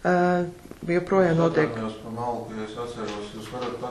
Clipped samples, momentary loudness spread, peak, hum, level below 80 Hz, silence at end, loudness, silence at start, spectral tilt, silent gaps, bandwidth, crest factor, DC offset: under 0.1%; 13 LU; -8 dBFS; none; -52 dBFS; 0 s; -26 LUFS; 0 s; -7 dB/octave; none; 12.5 kHz; 18 dB; under 0.1%